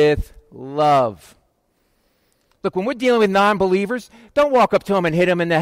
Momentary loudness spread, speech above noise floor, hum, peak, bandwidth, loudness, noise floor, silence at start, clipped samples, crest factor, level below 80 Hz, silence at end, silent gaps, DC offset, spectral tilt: 12 LU; 48 dB; none; -6 dBFS; 16 kHz; -18 LUFS; -65 dBFS; 0 s; under 0.1%; 12 dB; -42 dBFS; 0 s; none; under 0.1%; -6 dB/octave